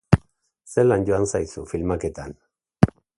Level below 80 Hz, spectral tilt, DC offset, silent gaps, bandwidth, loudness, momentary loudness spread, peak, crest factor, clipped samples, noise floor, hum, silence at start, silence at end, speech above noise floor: -40 dBFS; -7 dB/octave; under 0.1%; none; 11.5 kHz; -23 LUFS; 12 LU; 0 dBFS; 22 dB; under 0.1%; -57 dBFS; none; 0.1 s; 0.35 s; 35 dB